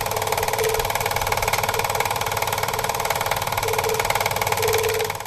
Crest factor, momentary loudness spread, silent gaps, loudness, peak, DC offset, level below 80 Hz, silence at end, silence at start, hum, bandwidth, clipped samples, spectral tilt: 20 dB; 2 LU; none; -22 LUFS; -2 dBFS; under 0.1%; -42 dBFS; 0 s; 0 s; none; 15 kHz; under 0.1%; -2 dB/octave